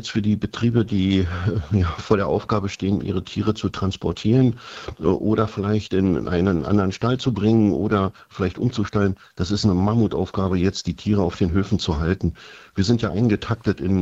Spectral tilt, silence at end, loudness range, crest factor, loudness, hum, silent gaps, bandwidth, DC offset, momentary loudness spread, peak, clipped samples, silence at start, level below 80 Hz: -7 dB/octave; 0 s; 2 LU; 20 dB; -22 LUFS; none; none; 8 kHz; under 0.1%; 6 LU; -2 dBFS; under 0.1%; 0 s; -42 dBFS